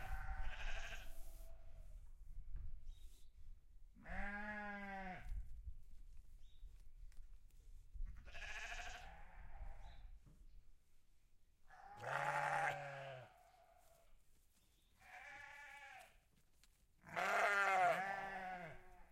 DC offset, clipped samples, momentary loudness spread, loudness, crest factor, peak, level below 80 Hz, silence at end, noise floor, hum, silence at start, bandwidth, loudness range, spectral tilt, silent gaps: under 0.1%; under 0.1%; 27 LU; -44 LUFS; 24 dB; -24 dBFS; -56 dBFS; 0.05 s; -74 dBFS; none; 0 s; 15.5 kHz; 19 LU; -4 dB/octave; none